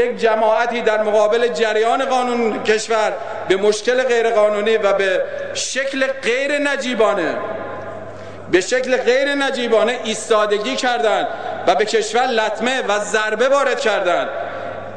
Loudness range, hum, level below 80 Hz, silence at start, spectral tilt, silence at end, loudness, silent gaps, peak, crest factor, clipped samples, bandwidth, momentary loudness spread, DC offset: 2 LU; none; -60 dBFS; 0 s; -2.5 dB/octave; 0 s; -17 LUFS; none; -2 dBFS; 14 dB; under 0.1%; 10 kHz; 8 LU; 1%